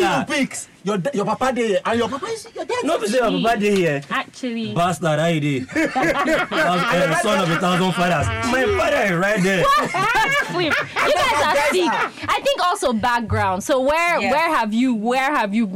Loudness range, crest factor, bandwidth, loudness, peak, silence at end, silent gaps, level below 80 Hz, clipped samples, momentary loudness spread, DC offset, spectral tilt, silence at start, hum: 3 LU; 8 dB; 16 kHz; -19 LUFS; -10 dBFS; 0 s; none; -46 dBFS; under 0.1%; 6 LU; under 0.1%; -4.5 dB/octave; 0 s; none